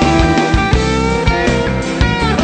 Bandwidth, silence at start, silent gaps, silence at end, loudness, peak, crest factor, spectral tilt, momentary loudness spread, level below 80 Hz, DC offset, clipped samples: 9 kHz; 0 s; none; 0 s; -14 LUFS; 0 dBFS; 12 dB; -5.5 dB/octave; 3 LU; -20 dBFS; under 0.1%; under 0.1%